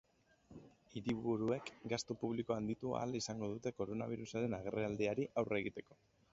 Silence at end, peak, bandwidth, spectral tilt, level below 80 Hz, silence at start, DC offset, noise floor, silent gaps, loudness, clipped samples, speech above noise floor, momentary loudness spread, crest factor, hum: 0.5 s; -22 dBFS; 7.6 kHz; -5.5 dB/octave; -70 dBFS; 0.5 s; under 0.1%; -66 dBFS; none; -41 LUFS; under 0.1%; 26 dB; 11 LU; 20 dB; none